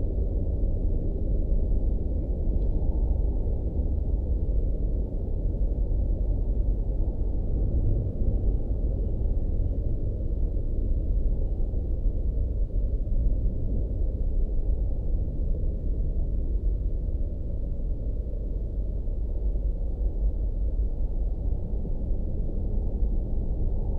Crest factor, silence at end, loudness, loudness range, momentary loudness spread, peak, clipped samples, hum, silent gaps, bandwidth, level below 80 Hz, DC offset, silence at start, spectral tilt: 12 dB; 0 s; -31 LUFS; 3 LU; 4 LU; -12 dBFS; under 0.1%; none; none; 1 kHz; -26 dBFS; under 0.1%; 0 s; -12.5 dB/octave